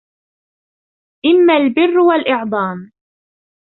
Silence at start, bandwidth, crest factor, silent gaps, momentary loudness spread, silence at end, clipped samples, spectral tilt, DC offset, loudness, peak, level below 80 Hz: 1.25 s; 4.2 kHz; 14 dB; none; 10 LU; 0.75 s; under 0.1%; -9.5 dB/octave; under 0.1%; -13 LUFS; -2 dBFS; -62 dBFS